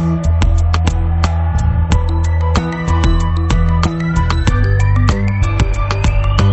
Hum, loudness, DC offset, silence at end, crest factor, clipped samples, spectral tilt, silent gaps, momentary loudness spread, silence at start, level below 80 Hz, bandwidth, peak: none; -15 LUFS; under 0.1%; 0 s; 12 dB; under 0.1%; -6.5 dB/octave; none; 2 LU; 0 s; -16 dBFS; 8.4 kHz; 0 dBFS